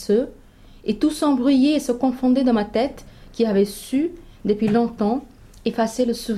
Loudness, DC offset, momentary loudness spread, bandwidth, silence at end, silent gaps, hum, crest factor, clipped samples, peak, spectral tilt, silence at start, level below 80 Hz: -21 LUFS; under 0.1%; 10 LU; 14 kHz; 0 s; none; none; 14 dB; under 0.1%; -8 dBFS; -6 dB/octave; 0 s; -46 dBFS